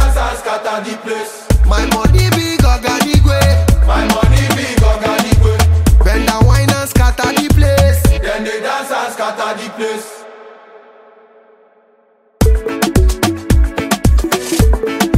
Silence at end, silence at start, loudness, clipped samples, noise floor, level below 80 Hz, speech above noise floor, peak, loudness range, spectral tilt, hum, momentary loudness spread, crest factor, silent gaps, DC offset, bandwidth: 0 s; 0 s; -13 LUFS; under 0.1%; -52 dBFS; -16 dBFS; 39 dB; 0 dBFS; 10 LU; -5.5 dB/octave; none; 9 LU; 12 dB; none; under 0.1%; 16 kHz